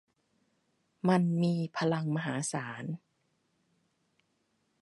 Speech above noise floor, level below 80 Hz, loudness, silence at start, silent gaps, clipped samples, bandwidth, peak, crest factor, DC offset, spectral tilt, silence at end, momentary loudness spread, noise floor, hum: 46 dB; -78 dBFS; -32 LUFS; 1.05 s; none; under 0.1%; 11.5 kHz; -12 dBFS; 22 dB; under 0.1%; -6 dB/octave; 1.85 s; 13 LU; -76 dBFS; none